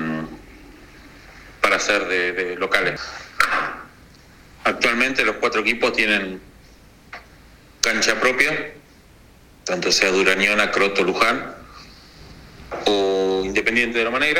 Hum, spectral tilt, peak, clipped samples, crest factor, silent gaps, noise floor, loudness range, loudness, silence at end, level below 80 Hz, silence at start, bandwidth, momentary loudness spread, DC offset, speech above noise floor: none; -2.5 dB/octave; 0 dBFS; under 0.1%; 22 dB; none; -49 dBFS; 3 LU; -19 LUFS; 0 s; -48 dBFS; 0 s; 17.5 kHz; 17 LU; under 0.1%; 29 dB